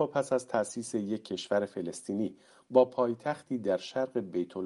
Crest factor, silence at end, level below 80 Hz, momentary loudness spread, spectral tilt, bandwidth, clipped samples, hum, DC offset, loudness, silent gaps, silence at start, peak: 22 dB; 0 s; -78 dBFS; 9 LU; -5 dB/octave; 11.5 kHz; under 0.1%; none; under 0.1%; -32 LUFS; none; 0 s; -10 dBFS